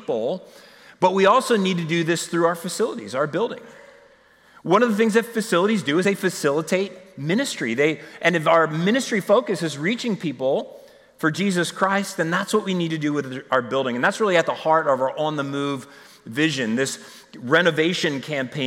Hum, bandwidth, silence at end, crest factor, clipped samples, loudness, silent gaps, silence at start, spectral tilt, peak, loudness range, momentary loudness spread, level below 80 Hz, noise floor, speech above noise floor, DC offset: none; 16.5 kHz; 0 s; 18 dB; under 0.1%; -21 LUFS; none; 0 s; -4.5 dB/octave; -4 dBFS; 2 LU; 8 LU; -72 dBFS; -54 dBFS; 32 dB; under 0.1%